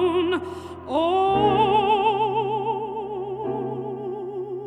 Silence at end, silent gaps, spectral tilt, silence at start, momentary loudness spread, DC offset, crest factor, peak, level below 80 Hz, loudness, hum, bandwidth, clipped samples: 0 s; none; -7 dB/octave; 0 s; 12 LU; under 0.1%; 14 dB; -8 dBFS; -52 dBFS; -23 LUFS; none; 10.5 kHz; under 0.1%